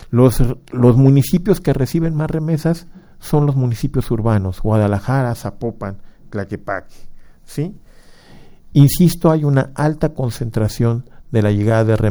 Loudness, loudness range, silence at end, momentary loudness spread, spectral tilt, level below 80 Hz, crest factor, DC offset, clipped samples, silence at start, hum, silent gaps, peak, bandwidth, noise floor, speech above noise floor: -17 LUFS; 8 LU; 0 s; 13 LU; -7.5 dB/octave; -32 dBFS; 16 dB; under 0.1%; under 0.1%; 0.05 s; none; none; 0 dBFS; over 20 kHz; -42 dBFS; 26 dB